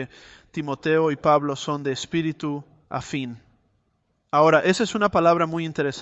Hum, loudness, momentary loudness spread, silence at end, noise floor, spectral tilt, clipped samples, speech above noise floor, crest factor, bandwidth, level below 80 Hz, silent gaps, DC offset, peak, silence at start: none; -22 LUFS; 15 LU; 0 s; -70 dBFS; -5.5 dB/octave; under 0.1%; 48 dB; 18 dB; 8.4 kHz; -58 dBFS; none; under 0.1%; -4 dBFS; 0 s